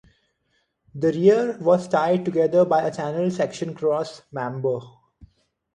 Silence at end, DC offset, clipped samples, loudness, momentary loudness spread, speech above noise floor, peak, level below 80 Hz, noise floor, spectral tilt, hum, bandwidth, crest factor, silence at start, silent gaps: 0.5 s; under 0.1%; under 0.1%; -22 LUFS; 12 LU; 49 dB; -4 dBFS; -64 dBFS; -70 dBFS; -7 dB/octave; none; 10 kHz; 18 dB; 0.95 s; none